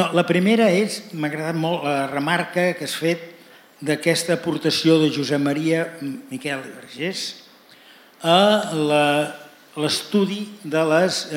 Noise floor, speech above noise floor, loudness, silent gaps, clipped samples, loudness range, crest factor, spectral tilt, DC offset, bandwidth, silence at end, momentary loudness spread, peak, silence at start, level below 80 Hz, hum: -49 dBFS; 28 dB; -21 LUFS; none; under 0.1%; 3 LU; 20 dB; -4.5 dB/octave; under 0.1%; 17 kHz; 0 s; 13 LU; -2 dBFS; 0 s; -74 dBFS; none